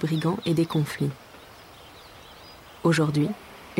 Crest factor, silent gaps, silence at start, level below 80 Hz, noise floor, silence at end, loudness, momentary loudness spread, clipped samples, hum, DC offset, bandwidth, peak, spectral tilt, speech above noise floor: 16 dB; none; 0 s; -60 dBFS; -47 dBFS; 0 s; -25 LUFS; 23 LU; under 0.1%; none; under 0.1%; 16 kHz; -10 dBFS; -6.5 dB/octave; 23 dB